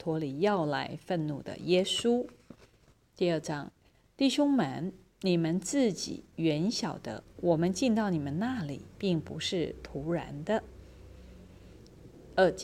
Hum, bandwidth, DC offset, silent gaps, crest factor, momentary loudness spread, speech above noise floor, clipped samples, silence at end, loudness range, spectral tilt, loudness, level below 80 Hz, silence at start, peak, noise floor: none; 15 kHz; under 0.1%; none; 18 dB; 11 LU; 34 dB; under 0.1%; 0 s; 5 LU; -5.5 dB/octave; -31 LUFS; -58 dBFS; 0 s; -12 dBFS; -64 dBFS